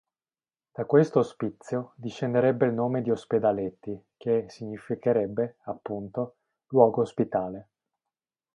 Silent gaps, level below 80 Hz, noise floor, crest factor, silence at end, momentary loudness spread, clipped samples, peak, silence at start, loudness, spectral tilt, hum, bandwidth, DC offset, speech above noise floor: none; -66 dBFS; under -90 dBFS; 24 dB; 0.95 s; 16 LU; under 0.1%; -4 dBFS; 0.8 s; -27 LUFS; -8.5 dB/octave; none; 9.6 kHz; under 0.1%; over 64 dB